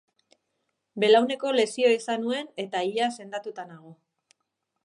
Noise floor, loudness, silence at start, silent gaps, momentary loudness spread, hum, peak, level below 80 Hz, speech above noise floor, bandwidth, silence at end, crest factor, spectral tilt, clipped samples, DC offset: -80 dBFS; -25 LUFS; 0.95 s; none; 18 LU; none; -8 dBFS; -84 dBFS; 55 dB; 11 kHz; 0.9 s; 20 dB; -3.5 dB/octave; under 0.1%; under 0.1%